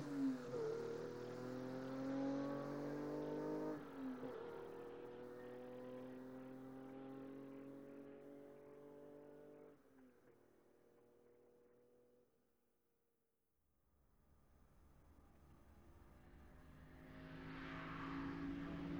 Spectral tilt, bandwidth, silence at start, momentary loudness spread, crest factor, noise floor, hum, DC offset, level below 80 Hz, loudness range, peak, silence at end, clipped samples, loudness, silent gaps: -7 dB/octave; over 20 kHz; 0 s; 21 LU; 18 dB; -88 dBFS; none; under 0.1%; -70 dBFS; 19 LU; -34 dBFS; 0 s; under 0.1%; -50 LUFS; none